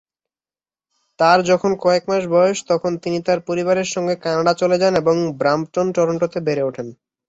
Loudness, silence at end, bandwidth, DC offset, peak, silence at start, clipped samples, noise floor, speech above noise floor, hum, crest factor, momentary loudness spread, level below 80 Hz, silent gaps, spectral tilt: -18 LUFS; 0.35 s; 8 kHz; under 0.1%; -2 dBFS; 1.2 s; under 0.1%; under -90 dBFS; over 72 dB; none; 18 dB; 7 LU; -60 dBFS; none; -5 dB/octave